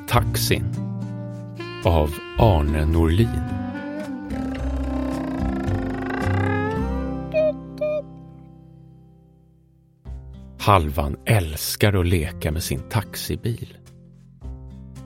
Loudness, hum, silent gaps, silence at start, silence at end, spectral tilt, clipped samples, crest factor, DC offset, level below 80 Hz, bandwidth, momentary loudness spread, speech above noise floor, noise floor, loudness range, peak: -23 LUFS; none; none; 0 s; 0 s; -6 dB/octave; under 0.1%; 22 dB; under 0.1%; -32 dBFS; 16.5 kHz; 20 LU; 35 dB; -56 dBFS; 5 LU; -2 dBFS